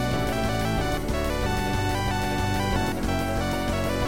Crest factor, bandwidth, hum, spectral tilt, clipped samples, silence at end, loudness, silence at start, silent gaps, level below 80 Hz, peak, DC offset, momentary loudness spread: 12 dB; 17 kHz; none; -5.5 dB/octave; under 0.1%; 0 s; -26 LUFS; 0 s; none; -34 dBFS; -12 dBFS; 1%; 1 LU